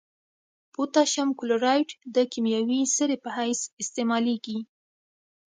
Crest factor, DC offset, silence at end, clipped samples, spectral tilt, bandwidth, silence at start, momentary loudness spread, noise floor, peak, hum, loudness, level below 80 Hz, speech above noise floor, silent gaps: 18 dB; under 0.1%; 0.85 s; under 0.1%; -2.5 dB/octave; 9.6 kHz; 0.8 s; 9 LU; under -90 dBFS; -8 dBFS; none; -26 LUFS; -80 dBFS; over 65 dB; 3.73-3.77 s